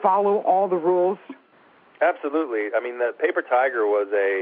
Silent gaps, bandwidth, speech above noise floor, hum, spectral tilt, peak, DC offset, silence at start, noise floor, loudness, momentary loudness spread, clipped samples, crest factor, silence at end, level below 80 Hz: none; 4.5 kHz; 34 dB; none; -4 dB/octave; -6 dBFS; under 0.1%; 0 s; -55 dBFS; -22 LUFS; 5 LU; under 0.1%; 16 dB; 0 s; -88 dBFS